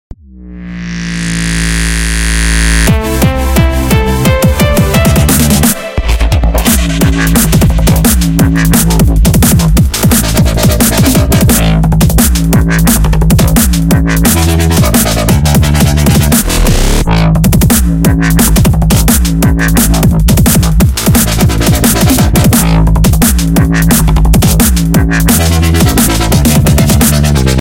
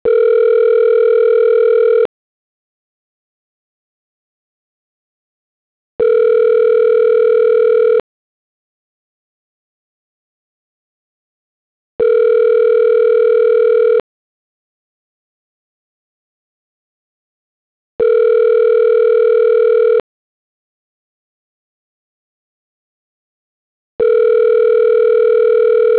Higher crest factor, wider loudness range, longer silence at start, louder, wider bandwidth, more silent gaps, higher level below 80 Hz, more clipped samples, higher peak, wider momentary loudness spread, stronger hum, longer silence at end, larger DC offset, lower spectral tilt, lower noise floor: about the same, 8 dB vs 8 dB; second, 1 LU vs 8 LU; about the same, 0.1 s vs 0.05 s; first, -8 LUFS vs -11 LUFS; first, 17.5 kHz vs 4 kHz; second, none vs 2.05-5.99 s, 8.00-11.99 s, 14.00-17.99 s, 20.00-23.99 s; first, -12 dBFS vs -60 dBFS; first, 0.2% vs under 0.1%; first, 0 dBFS vs -6 dBFS; about the same, 3 LU vs 3 LU; neither; about the same, 0 s vs 0 s; neither; second, -5 dB/octave vs -7.5 dB/octave; second, -28 dBFS vs under -90 dBFS